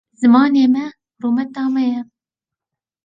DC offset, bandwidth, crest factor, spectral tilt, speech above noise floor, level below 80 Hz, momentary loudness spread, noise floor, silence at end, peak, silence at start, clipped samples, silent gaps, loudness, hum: under 0.1%; 7.8 kHz; 16 dB; -6 dB/octave; 72 dB; -68 dBFS; 14 LU; -87 dBFS; 1 s; -2 dBFS; 0.2 s; under 0.1%; none; -16 LUFS; none